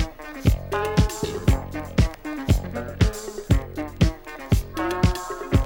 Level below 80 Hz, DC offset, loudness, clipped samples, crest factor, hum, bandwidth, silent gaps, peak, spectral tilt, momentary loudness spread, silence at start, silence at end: -28 dBFS; under 0.1%; -25 LUFS; under 0.1%; 18 dB; none; 18 kHz; none; -6 dBFS; -6.5 dB/octave; 8 LU; 0 s; 0 s